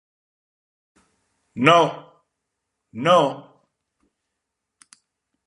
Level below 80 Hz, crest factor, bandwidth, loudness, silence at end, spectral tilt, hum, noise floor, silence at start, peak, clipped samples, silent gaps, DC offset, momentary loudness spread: -72 dBFS; 24 dB; 11.5 kHz; -18 LUFS; 2.05 s; -5 dB/octave; none; -81 dBFS; 1.55 s; -2 dBFS; under 0.1%; none; under 0.1%; 24 LU